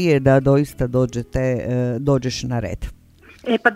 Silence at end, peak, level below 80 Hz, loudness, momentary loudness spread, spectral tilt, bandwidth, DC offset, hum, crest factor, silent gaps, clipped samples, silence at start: 0 s; 0 dBFS; -38 dBFS; -20 LUFS; 14 LU; -7 dB/octave; 14.5 kHz; under 0.1%; none; 18 dB; none; under 0.1%; 0 s